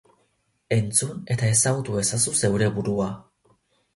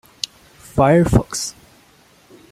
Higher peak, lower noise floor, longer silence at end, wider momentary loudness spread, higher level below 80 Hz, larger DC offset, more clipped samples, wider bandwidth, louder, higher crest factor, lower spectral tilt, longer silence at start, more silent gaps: second, -6 dBFS vs -2 dBFS; first, -69 dBFS vs -52 dBFS; second, 0.75 s vs 1 s; second, 8 LU vs 15 LU; second, -52 dBFS vs -34 dBFS; neither; neither; second, 12 kHz vs 15.5 kHz; second, -23 LUFS vs -18 LUFS; about the same, 18 dB vs 18 dB; second, -4 dB/octave vs -5.5 dB/octave; about the same, 0.7 s vs 0.75 s; neither